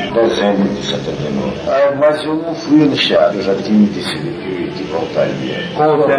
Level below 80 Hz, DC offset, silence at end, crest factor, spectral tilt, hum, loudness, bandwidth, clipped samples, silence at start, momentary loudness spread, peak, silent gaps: -46 dBFS; under 0.1%; 0 s; 14 dB; -6 dB/octave; none; -15 LUFS; 10.5 kHz; under 0.1%; 0 s; 9 LU; 0 dBFS; none